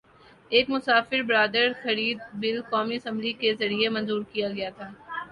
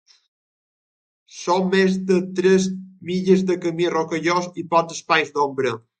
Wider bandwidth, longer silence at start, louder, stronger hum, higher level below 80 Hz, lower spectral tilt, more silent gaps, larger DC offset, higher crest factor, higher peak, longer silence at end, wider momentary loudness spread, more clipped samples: first, 10.5 kHz vs 9 kHz; second, 0.5 s vs 1.35 s; second, -25 LUFS vs -20 LUFS; neither; about the same, -66 dBFS vs -66 dBFS; about the same, -5.5 dB/octave vs -5.5 dB/octave; neither; neither; about the same, 20 dB vs 20 dB; second, -6 dBFS vs -2 dBFS; second, 0 s vs 0.2 s; about the same, 9 LU vs 7 LU; neither